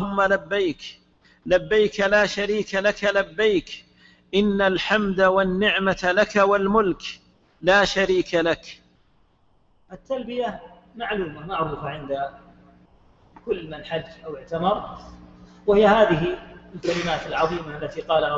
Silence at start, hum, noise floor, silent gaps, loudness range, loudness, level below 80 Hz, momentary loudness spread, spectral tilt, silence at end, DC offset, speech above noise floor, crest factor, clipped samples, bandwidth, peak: 0 s; none; -63 dBFS; none; 10 LU; -22 LUFS; -48 dBFS; 17 LU; -5 dB/octave; 0 s; under 0.1%; 41 dB; 18 dB; under 0.1%; 7.8 kHz; -4 dBFS